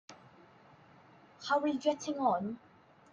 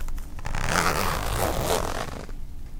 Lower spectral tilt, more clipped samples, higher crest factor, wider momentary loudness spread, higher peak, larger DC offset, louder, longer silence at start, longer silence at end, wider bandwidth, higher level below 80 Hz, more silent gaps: about the same, -4.5 dB/octave vs -3.5 dB/octave; neither; about the same, 18 dB vs 22 dB; about the same, 16 LU vs 15 LU; second, -18 dBFS vs -4 dBFS; neither; second, -33 LUFS vs -26 LUFS; about the same, 0.1 s vs 0 s; first, 0.55 s vs 0 s; second, 9.2 kHz vs 18.5 kHz; second, -80 dBFS vs -32 dBFS; neither